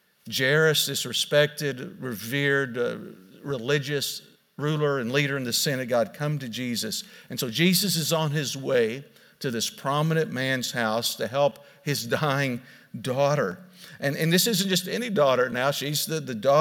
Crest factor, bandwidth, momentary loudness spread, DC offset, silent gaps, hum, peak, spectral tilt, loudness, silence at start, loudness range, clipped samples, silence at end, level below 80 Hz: 18 dB; 18 kHz; 13 LU; under 0.1%; none; none; -8 dBFS; -4 dB/octave; -25 LUFS; 0.25 s; 3 LU; under 0.1%; 0 s; -74 dBFS